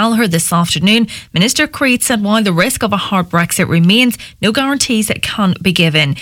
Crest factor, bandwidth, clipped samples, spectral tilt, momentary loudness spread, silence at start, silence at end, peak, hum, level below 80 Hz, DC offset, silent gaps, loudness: 12 dB; 17 kHz; under 0.1%; -4 dB/octave; 4 LU; 0 s; 0 s; 0 dBFS; none; -44 dBFS; under 0.1%; none; -12 LUFS